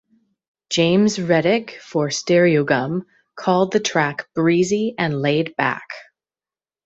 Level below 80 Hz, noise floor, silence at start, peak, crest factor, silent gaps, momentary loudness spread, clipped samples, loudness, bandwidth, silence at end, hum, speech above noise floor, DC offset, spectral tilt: -60 dBFS; under -90 dBFS; 0.7 s; -2 dBFS; 18 dB; none; 10 LU; under 0.1%; -19 LUFS; 8.2 kHz; 0.85 s; none; over 71 dB; under 0.1%; -5 dB/octave